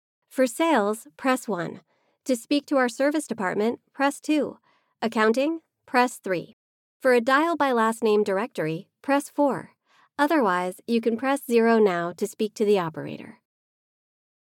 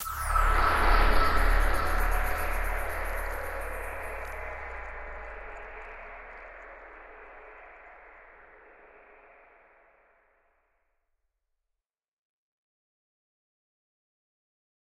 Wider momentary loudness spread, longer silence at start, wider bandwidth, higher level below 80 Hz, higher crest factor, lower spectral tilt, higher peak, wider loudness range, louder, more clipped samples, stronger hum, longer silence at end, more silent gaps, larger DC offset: second, 11 LU vs 24 LU; first, 0.35 s vs 0 s; about the same, 17 kHz vs 16 kHz; second, -86 dBFS vs -34 dBFS; about the same, 18 dB vs 20 dB; about the same, -4.5 dB/octave vs -4.5 dB/octave; about the same, -8 dBFS vs -10 dBFS; second, 3 LU vs 25 LU; first, -24 LUFS vs -30 LUFS; neither; neither; second, 1.15 s vs 2.5 s; first, 6.53-7.00 s vs 12.08-12.26 s; neither